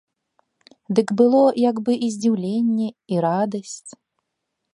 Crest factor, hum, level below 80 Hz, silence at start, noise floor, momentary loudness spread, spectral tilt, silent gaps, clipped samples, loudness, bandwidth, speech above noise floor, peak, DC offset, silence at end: 18 dB; none; -72 dBFS; 0.9 s; -78 dBFS; 10 LU; -6.5 dB/octave; none; under 0.1%; -20 LUFS; 11 kHz; 59 dB; -2 dBFS; under 0.1%; 0.85 s